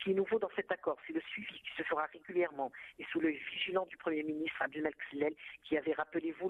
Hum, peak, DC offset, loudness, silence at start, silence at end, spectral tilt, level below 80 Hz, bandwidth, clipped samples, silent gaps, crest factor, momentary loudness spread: none; -18 dBFS; under 0.1%; -37 LUFS; 0 s; 0 s; -7 dB/octave; -76 dBFS; 4.1 kHz; under 0.1%; none; 18 dB; 7 LU